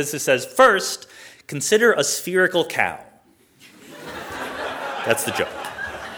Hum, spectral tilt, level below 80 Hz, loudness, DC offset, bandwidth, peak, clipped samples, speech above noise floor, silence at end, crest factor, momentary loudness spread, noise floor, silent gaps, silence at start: none; -2.5 dB/octave; -58 dBFS; -20 LUFS; under 0.1%; over 20 kHz; -2 dBFS; under 0.1%; 36 dB; 0 s; 20 dB; 19 LU; -55 dBFS; none; 0 s